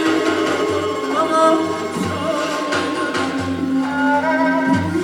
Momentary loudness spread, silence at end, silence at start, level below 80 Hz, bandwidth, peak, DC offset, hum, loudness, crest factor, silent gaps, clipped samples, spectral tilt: 6 LU; 0 s; 0 s; -60 dBFS; 17 kHz; -2 dBFS; under 0.1%; none; -18 LUFS; 16 dB; none; under 0.1%; -5 dB/octave